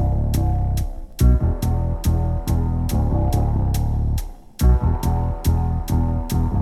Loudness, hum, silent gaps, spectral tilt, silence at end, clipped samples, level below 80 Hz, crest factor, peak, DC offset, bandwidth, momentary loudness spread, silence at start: -21 LUFS; none; none; -7.5 dB/octave; 0 s; under 0.1%; -22 dBFS; 14 dB; -4 dBFS; under 0.1%; 15 kHz; 5 LU; 0 s